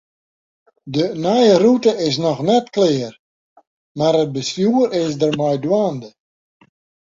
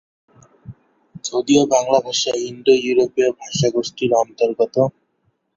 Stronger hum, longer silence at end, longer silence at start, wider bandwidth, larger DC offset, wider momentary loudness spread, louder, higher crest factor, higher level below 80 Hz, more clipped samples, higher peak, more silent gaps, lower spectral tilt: neither; first, 1 s vs 0.65 s; first, 0.85 s vs 0.65 s; about the same, 7.8 kHz vs 7.8 kHz; neither; first, 10 LU vs 7 LU; about the same, -17 LUFS vs -18 LUFS; about the same, 16 dB vs 18 dB; about the same, -60 dBFS vs -58 dBFS; neither; about the same, -2 dBFS vs -2 dBFS; first, 3.19-3.56 s, 3.67-3.95 s vs none; first, -6 dB/octave vs -4.5 dB/octave